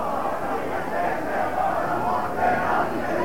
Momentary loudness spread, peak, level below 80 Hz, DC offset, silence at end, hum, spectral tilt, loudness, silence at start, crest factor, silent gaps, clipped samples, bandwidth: 5 LU; -12 dBFS; -48 dBFS; 2%; 0 s; none; -6 dB/octave; -25 LUFS; 0 s; 14 dB; none; under 0.1%; 17 kHz